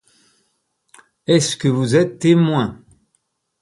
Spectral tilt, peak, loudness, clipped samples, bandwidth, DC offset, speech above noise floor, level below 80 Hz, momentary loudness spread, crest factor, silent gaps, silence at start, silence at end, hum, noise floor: -5.5 dB/octave; -2 dBFS; -17 LUFS; under 0.1%; 11.5 kHz; under 0.1%; 53 dB; -56 dBFS; 8 LU; 18 dB; none; 1.3 s; 0.9 s; none; -69 dBFS